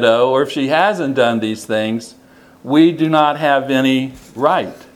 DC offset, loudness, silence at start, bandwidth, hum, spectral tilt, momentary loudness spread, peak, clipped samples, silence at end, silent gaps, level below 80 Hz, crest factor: under 0.1%; -15 LUFS; 0 s; 15 kHz; none; -5.5 dB/octave; 8 LU; 0 dBFS; under 0.1%; 0.2 s; none; -58 dBFS; 16 dB